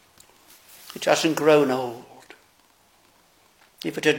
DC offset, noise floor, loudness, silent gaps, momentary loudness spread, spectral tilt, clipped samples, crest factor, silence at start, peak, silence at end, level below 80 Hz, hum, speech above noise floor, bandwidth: under 0.1%; -60 dBFS; -22 LUFS; none; 23 LU; -4 dB/octave; under 0.1%; 22 dB; 0.85 s; -4 dBFS; 0 s; -74 dBFS; none; 38 dB; 17 kHz